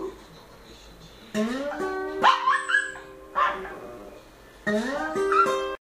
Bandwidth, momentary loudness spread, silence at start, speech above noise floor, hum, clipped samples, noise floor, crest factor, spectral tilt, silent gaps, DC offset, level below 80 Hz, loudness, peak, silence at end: 15.5 kHz; 19 LU; 0 s; 21 dB; none; under 0.1%; -49 dBFS; 22 dB; -3.5 dB/octave; none; under 0.1%; -56 dBFS; -25 LUFS; -6 dBFS; 0.1 s